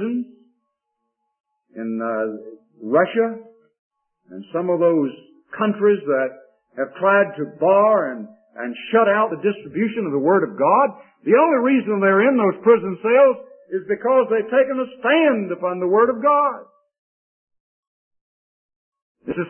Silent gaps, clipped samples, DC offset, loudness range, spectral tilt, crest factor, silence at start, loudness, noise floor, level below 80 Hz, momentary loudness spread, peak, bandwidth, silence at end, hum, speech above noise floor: 1.40-1.44 s, 3.78-3.91 s, 16.98-17.47 s, 17.60-18.11 s, 18.21-18.69 s, 18.76-18.92 s, 19.02-19.15 s; under 0.1%; under 0.1%; 8 LU; -11 dB/octave; 18 dB; 0 s; -19 LUFS; -77 dBFS; -70 dBFS; 14 LU; -2 dBFS; 3.3 kHz; 0 s; none; 59 dB